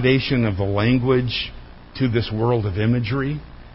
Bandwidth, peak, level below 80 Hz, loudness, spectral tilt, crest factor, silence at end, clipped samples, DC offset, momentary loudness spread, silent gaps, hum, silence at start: 5.8 kHz; -4 dBFS; -38 dBFS; -21 LUFS; -11.5 dB/octave; 16 dB; 0 s; under 0.1%; under 0.1%; 9 LU; none; none; 0 s